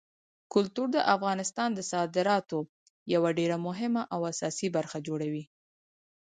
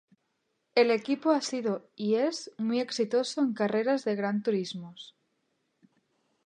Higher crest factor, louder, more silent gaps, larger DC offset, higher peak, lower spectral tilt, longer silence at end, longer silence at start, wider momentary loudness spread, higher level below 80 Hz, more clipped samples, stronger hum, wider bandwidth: about the same, 20 dB vs 20 dB; about the same, -30 LUFS vs -29 LUFS; first, 2.69-3.06 s vs none; neither; about the same, -10 dBFS vs -10 dBFS; about the same, -5 dB/octave vs -5 dB/octave; second, 0.85 s vs 1.4 s; second, 0.5 s vs 0.75 s; about the same, 9 LU vs 10 LU; first, -76 dBFS vs -84 dBFS; neither; neither; about the same, 9.6 kHz vs 10.5 kHz